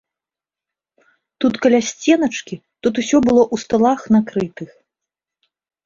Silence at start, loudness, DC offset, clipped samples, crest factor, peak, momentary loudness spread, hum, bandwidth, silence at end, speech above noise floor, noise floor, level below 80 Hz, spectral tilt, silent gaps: 1.4 s; -17 LUFS; under 0.1%; under 0.1%; 16 dB; -2 dBFS; 13 LU; none; 7.6 kHz; 1.2 s; 73 dB; -89 dBFS; -54 dBFS; -5 dB/octave; none